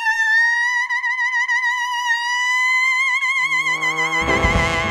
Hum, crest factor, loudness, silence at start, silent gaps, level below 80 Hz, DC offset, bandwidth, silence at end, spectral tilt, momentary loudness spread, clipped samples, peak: none; 16 dB; -17 LUFS; 0 s; none; -34 dBFS; under 0.1%; 14 kHz; 0 s; -2.5 dB/octave; 4 LU; under 0.1%; -4 dBFS